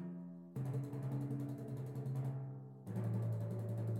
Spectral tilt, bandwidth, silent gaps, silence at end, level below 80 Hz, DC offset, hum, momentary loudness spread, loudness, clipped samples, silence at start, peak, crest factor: -9.5 dB/octave; 14 kHz; none; 0 s; -76 dBFS; under 0.1%; none; 9 LU; -43 LUFS; under 0.1%; 0 s; -30 dBFS; 12 dB